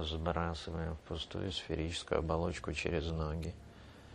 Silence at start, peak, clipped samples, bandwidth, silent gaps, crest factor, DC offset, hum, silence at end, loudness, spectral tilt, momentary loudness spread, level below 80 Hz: 0 s; -16 dBFS; under 0.1%; 10.5 kHz; none; 22 dB; under 0.1%; none; 0 s; -38 LUFS; -5.5 dB/octave; 8 LU; -48 dBFS